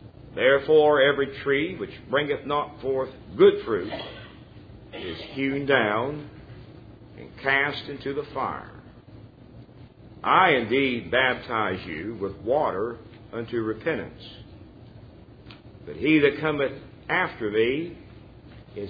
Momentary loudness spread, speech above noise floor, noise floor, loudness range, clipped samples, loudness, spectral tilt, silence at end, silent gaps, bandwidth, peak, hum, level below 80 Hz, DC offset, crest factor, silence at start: 23 LU; 23 dB; -47 dBFS; 7 LU; under 0.1%; -24 LUFS; -8 dB/octave; 0 s; none; 5 kHz; -4 dBFS; none; -54 dBFS; under 0.1%; 22 dB; 0 s